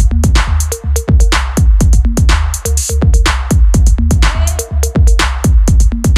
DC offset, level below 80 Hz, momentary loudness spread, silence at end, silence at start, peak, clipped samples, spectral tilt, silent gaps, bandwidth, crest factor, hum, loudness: under 0.1%; -10 dBFS; 5 LU; 0 s; 0 s; 0 dBFS; under 0.1%; -5 dB/octave; none; 14.5 kHz; 8 dB; none; -12 LUFS